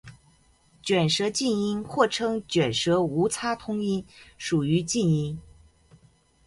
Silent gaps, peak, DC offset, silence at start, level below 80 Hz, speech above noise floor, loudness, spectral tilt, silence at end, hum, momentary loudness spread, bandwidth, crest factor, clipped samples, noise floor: none; -6 dBFS; under 0.1%; 0.05 s; -56 dBFS; 35 dB; -25 LUFS; -5 dB/octave; 1.05 s; none; 7 LU; 11.5 kHz; 20 dB; under 0.1%; -61 dBFS